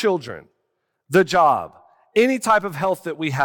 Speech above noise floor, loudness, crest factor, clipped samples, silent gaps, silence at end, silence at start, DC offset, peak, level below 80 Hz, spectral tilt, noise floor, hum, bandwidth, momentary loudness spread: 55 dB; -19 LUFS; 16 dB; under 0.1%; none; 0 s; 0 s; under 0.1%; -4 dBFS; -60 dBFS; -5 dB/octave; -74 dBFS; none; 17.5 kHz; 15 LU